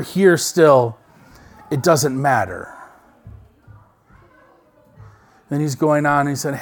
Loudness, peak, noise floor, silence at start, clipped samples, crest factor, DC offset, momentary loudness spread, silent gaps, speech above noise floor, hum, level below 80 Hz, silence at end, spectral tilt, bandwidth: -17 LUFS; 0 dBFS; -53 dBFS; 0 s; under 0.1%; 20 dB; under 0.1%; 14 LU; none; 36 dB; none; -54 dBFS; 0 s; -5 dB/octave; 19 kHz